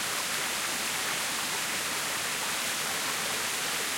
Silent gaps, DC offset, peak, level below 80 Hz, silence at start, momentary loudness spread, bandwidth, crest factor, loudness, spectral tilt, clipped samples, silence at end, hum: none; under 0.1%; -16 dBFS; -66 dBFS; 0 s; 0 LU; 16.5 kHz; 14 dB; -29 LUFS; 0 dB/octave; under 0.1%; 0 s; none